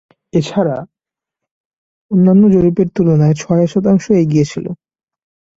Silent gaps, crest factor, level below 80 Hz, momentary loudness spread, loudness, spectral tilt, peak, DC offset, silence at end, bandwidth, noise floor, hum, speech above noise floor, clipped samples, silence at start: 1.51-2.09 s; 12 dB; -46 dBFS; 12 LU; -13 LUFS; -8 dB/octave; -2 dBFS; under 0.1%; 0.85 s; 7.8 kHz; -84 dBFS; none; 73 dB; under 0.1%; 0.35 s